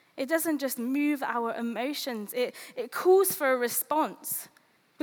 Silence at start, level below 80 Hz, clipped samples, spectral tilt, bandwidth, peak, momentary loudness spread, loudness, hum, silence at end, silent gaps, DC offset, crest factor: 0.15 s; -86 dBFS; under 0.1%; -2.5 dB/octave; over 20 kHz; -12 dBFS; 11 LU; -28 LUFS; none; 0.55 s; none; under 0.1%; 18 dB